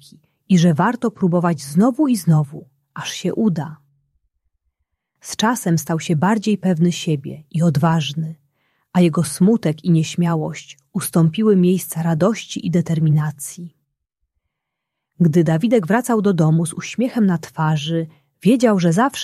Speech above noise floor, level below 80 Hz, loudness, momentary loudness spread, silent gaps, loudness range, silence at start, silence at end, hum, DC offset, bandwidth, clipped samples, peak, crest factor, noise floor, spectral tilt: 63 dB; -60 dBFS; -18 LUFS; 12 LU; none; 4 LU; 0.5 s; 0 s; none; under 0.1%; 14.5 kHz; under 0.1%; -2 dBFS; 16 dB; -80 dBFS; -6.5 dB/octave